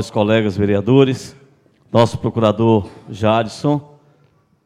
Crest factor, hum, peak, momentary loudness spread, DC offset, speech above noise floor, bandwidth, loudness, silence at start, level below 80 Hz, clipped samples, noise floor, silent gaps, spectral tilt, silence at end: 18 dB; none; 0 dBFS; 8 LU; under 0.1%; 41 dB; 12 kHz; -16 LUFS; 0 s; -50 dBFS; under 0.1%; -56 dBFS; none; -7 dB/octave; 0.85 s